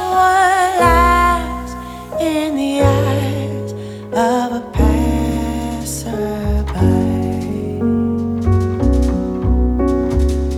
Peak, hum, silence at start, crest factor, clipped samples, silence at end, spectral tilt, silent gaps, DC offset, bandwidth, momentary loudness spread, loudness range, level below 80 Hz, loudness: 0 dBFS; none; 0 s; 16 dB; under 0.1%; 0 s; -6.5 dB/octave; none; under 0.1%; 15.5 kHz; 10 LU; 4 LU; -22 dBFS; -16 LUFS